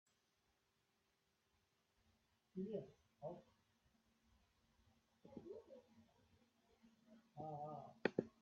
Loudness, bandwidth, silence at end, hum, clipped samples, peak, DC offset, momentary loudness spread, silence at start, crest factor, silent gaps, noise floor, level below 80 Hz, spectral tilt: -51 LUFS; 7 kHz; 0.1 s; none; under 0.1%; -20 dBFS; under 0.1%; 20 LU; 2.55 s; 36 dB; none; -85 dBFS; -88 dBFS; -5.5 dB/octave